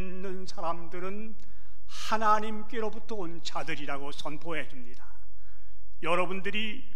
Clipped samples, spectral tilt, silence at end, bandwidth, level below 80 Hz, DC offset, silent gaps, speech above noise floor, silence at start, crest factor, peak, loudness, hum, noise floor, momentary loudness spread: under 0.1%; -4.5 dB/octave; 0 s; 16 kHz; -58 dBFS; 9%; none; 22 dB; 0 s; 22 dB; -10 dBFS; -33 LUFS; none; -56 dBFS; 14 LU